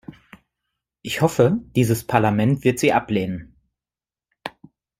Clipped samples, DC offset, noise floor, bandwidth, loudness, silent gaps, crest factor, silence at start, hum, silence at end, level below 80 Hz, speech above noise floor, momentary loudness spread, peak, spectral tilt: under 0.1%; under 0.1%; under -90 dBFS; 16 kHz; -20 LUFS; none; 20 dB; 0.1 s; none; 0.5 s; -54 dBFS; over 71 dB; 18 LU; -2 dBFS; -6 dB/octave